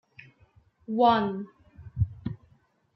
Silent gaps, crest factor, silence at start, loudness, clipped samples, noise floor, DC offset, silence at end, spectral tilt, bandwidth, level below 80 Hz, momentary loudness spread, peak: none; 20 dB; 0.9 s; -27 LUFS; under 0.1%; -64 dBFS; under 0.1%; 0.6 s; -9.5 dB/octave; 6 kHz; -50 dBFS; 23 LU; -10 dBFS